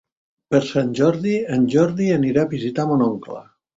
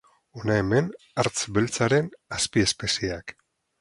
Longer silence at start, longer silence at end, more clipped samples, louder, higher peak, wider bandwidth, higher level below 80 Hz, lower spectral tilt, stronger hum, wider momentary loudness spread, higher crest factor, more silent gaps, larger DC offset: first, 0.5 s vs 0.35 s; second, 0.35 s vs 0.5 s; neither; first, -19 LUFS vs -25 LUFS; about the same, -4 dBFS vs -6 dBFS; second, 7.8 kHz vs 11.5 kHz; second, -56 dBFS vs -50 dBFS; first, -7.5 dB/octave vs -4 dB/octave; neither; second, 5 LU vs 10 LU; about the same, 16 dB vs 20 dB; neither; neither